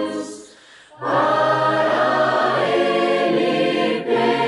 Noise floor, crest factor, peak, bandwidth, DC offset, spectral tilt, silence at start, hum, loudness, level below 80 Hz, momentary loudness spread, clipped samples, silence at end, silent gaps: -46 dBFS; 14 dB; -6 dBFS; 11.5 kHz; under 0.1%; -5 dB/octave; 0 s; none; -18 LUFS; -70 dBFS; 10 LU; under 0.1%; 0 s; none